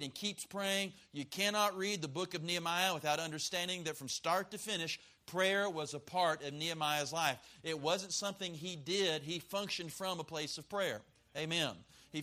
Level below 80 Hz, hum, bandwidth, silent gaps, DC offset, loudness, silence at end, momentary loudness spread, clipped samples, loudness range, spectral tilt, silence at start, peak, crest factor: -76 dBFS; none; 15.5 kHz; none; under 0.1%; -37 LUFS; 0 s; 9 LU; under 0.1%; 2 LU; -2.5 dB/octave; 0 s; -16 dBFS; 22 dB